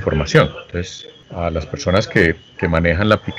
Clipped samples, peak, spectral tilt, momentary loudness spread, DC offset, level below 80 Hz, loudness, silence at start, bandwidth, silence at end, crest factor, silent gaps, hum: under 0.1%; 0 dBFS; -6 dB/octave; 12 LU; under 0.1%; -34 dBFS; -18 LUFS; 0 s; 10.5 kHz; 0 s; 18 dB; none; none